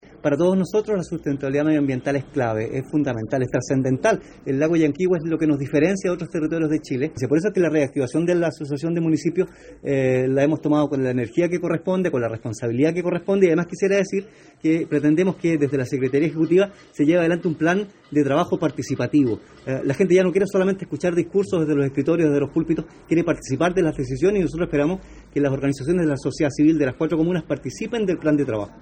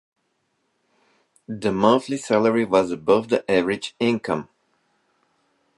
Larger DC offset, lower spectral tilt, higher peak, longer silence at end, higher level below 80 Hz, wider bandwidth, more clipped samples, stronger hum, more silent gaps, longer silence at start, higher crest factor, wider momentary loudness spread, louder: neither; first, -7 dB/octave vs -5.5 dB/octave; about the same, -4 dBFS vs -2 dBFS; second, 0.1 s vs 1.35 s; first, -50 dBFS vs -60 dBFS; second, 9.4 kHz vs 11.5 kHz; neither; neither; neither; second, 0.25 s vs 1.5 s; about the same, 16 dB vs 20 dB; second, 6 LU vs 9 LU; about the same, -21 LUFS vs -21 LUFS